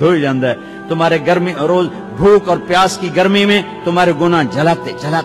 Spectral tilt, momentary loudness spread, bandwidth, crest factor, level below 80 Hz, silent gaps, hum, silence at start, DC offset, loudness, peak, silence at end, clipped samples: -5.5 dB/octave; 7 LU; 13.5 kHz; 10 dB; -44 dBFS; none; none; 0 s; under 0.1%; -13 LUFS; -2 dBFS; 0 s; under 0.1%